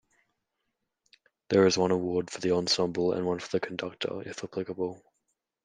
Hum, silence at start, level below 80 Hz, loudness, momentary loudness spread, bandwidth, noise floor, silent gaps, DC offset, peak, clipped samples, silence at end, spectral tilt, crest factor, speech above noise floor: none; 1.5 s; -70 dBFS; -29 LUFS; 12 LU; 9.8 kHz; -82 dBFS; none; under 0.1%; -10 dBFS; under 0.1%; 0.7 s; -4.5 dB/octave; 20 dB; 54 dB